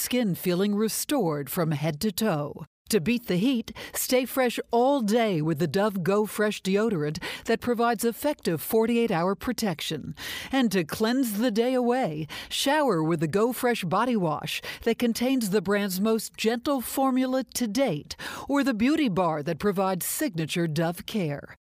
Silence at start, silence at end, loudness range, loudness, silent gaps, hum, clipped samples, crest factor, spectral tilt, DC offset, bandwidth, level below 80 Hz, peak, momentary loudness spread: 0 s; 0.15 s; 2 LU; -26 LUFS; 2.67-2.85 s; none; under 0.1%; 14 dB; -5 dB/octave; under 0.1%; 16 kHz; -58 dBFS; -12 dBFS; 6 LU